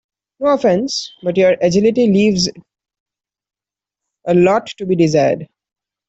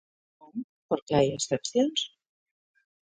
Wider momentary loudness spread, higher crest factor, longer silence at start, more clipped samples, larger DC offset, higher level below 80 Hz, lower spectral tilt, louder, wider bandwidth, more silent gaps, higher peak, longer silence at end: second, 8 LU vs 15 LU; second, 14 dB vs 20 dB; second, 0.4 s vs 0.55 s; neither; neither; first, -52 dBFS vs -62 dBFS; about the same, -5.5 dB/octave vs -4.5 dB/octave; first, -15 LUFS vs -28 LUFS; second, 8.2 kHz vs 9.6 kHz; second, 3.00-3.06 s vs 0.64-0.89 s, 1.02-1.06 s; first, -2 dBFS vs -10 dBFS; second, 0.65 s vs 1.1 s